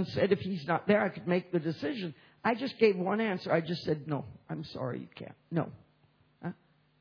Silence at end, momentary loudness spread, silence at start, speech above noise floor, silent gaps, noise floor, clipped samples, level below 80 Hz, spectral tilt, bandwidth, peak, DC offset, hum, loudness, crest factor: 0.45 s; 16 LU; 0 s; 36 dB; none; -67 dBFS; under 0.1%; -70 dBFS; -5.5 dB/octave; 5.4 kHz; -12 dBFS; under 0.1%; none; -32 LUFS; 20 dB